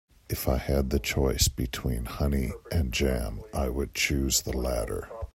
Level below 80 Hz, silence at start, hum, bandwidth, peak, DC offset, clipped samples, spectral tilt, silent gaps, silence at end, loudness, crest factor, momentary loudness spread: -34 dBFS; 0.3 s; none; 16 kHz; -8 dBFS; under 0.1%; under 0.1%; -4 dB/octave; none; 0.1 s; -28 LUFS; 20 dB; 7 LU